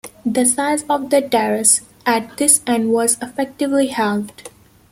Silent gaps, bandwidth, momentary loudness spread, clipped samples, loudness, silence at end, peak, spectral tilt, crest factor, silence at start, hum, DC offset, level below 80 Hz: none; 16.5 kHz; 8 LU; under 0.1%; -16 LUFS; 0.45 s; 0 dBFS; -2.5 dB/octave; 18 dB; 0.05 s; none; under 0.1%; -58 dBFS